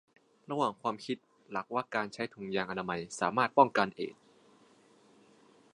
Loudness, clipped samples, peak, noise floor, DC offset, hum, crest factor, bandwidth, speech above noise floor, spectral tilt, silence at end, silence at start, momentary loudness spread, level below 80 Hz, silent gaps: -33 LUFS; under 0.1%; -8 dBFS; -63 dBFS; under 0.1%; none; 26 dB; 11 kHz; 31 dB; -5 dB/octave; 1.65 s; 0.5 s; 15 LU; -74 dBFS; none